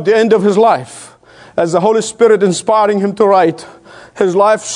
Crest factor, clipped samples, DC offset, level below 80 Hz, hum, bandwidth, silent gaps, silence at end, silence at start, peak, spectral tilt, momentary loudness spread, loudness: 12 dB; 0.1%; under 0.1%; -60 dBFS; none; 11 kHz; none; 0 s; 0 s; 0 dBFS; -5 dB/octave; 9 LU; -12 LUFS